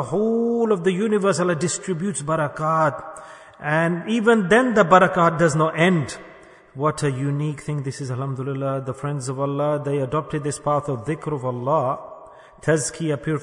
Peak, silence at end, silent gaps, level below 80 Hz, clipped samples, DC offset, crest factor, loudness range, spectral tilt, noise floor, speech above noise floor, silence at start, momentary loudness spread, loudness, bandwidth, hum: -2 dBFS; 0 s; none; -56 dBFS; under 0.1%; under 0.1%; 20 dB; 7 LU; -5.5 dB/octave; -43 dBFS; 22 dB; 0 s; 11 LU; -21 LUFS; 11 kHz; none